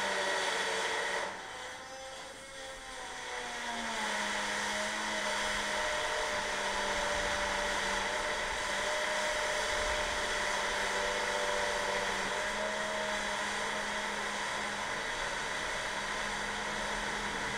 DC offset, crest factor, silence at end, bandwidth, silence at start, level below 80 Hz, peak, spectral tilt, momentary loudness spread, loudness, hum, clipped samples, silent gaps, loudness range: under 0.1%; 14 dB; 0 s; 16 kHz; 0 s; -54 dBFS; -20 dBFS; -1 dB/octave; 8 LU; -33 LUFS; none; under 0.1%; none; 5 LU